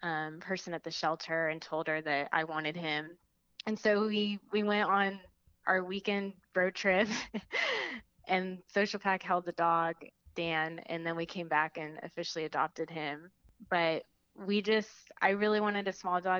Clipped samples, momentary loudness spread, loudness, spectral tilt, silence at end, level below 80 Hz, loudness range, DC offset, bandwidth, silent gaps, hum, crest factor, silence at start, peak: under 0.1%; 10 LU; -33 LUFS; -4.5 dB/octave; 0 s; -72 dBFS; 3 LU; under 0.1%; 7.6 kHz; none; none; 22 dB; 0 s; -12 dBFS